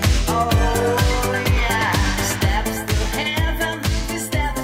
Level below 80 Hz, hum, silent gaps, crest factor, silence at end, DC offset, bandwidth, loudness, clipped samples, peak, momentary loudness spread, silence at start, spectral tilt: -24 dBFS; none; none; 14 dB; 0 s; under 0.1%; 16.5 kHz; -20 LUFS; under 0.1%; -6 dBFS; 4 LU; 0 s; -4.5 dB/octave